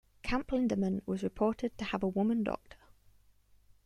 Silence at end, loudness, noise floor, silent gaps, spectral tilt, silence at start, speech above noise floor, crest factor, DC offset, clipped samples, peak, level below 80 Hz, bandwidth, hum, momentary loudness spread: 1.1 s; -34 LUFS; -64 dBFS; none; -7 dB/octave; 0.25 s; 32 dB; 18 dB; under 0.1%; under 0.1%; -18 dBFS; -54 dBFS; 11 kHz; 50 Hz at -60 dBFS; 6 LU